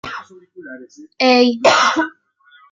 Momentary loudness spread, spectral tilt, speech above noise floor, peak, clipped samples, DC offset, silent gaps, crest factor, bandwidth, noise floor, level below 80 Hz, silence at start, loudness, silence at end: 23 LU; -2.5 dB/octave; 35 dB; 0 dBFS; under 0.1%; under 0.1%; none; 16 dB; 7.8 kHz; -51 dBFS; -64 dBFS; 0.05 s; -14 LUFS; 0.6 s